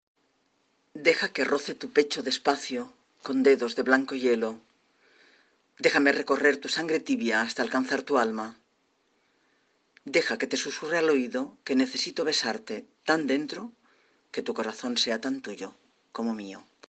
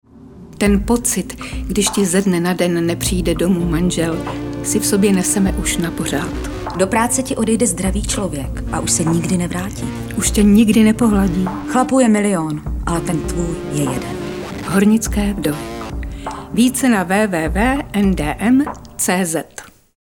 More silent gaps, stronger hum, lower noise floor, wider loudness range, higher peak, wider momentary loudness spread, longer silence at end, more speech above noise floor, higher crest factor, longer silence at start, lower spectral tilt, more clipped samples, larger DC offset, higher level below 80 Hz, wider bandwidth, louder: neither; neither; first, -71 dBFS vs -39 dBFS; about the same, 4 LU vs 4 LU; second, -6 dBFS vs -2 dBFS; first, 15 LU vs 11 LU; about the same, 0.3 s vs 0.35 s; first, 44 dB vs 23 dB; first, 24 dB vs 16 dB; first, 0.95 s vs 0.15 s; second, -3 dB/octave vs -5 dB/octave; neither; neither; second, -76 dBFS vs -30 dBFS; second, 9 kHz vs 18 kHz; second, -27 LUFS vs -17 LUFS